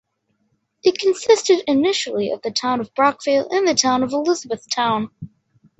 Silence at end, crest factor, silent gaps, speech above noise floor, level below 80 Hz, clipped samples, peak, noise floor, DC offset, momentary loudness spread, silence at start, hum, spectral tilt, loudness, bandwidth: 0.5 s; 18 dB; none; 50 dB; -62 dBFS; under 0.1%; -2 dBFS; -68 dBFS; under 0.1%; 7 LU; 0.85 s; none; -3 dB/octave; -19 LUFS; 8.2 kHz